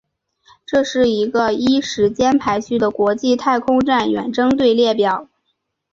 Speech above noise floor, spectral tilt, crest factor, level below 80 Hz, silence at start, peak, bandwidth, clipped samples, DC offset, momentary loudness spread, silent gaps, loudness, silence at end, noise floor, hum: 55 dB; -5 dB/octave; 14 dB; -52 dBFS; 0.7 s; -4 dBFS; 7.6 kHz; under 0.1%; under 0.1%; 5 LU; none; -17 LUFS; 0.7 s; -71 dBFS; none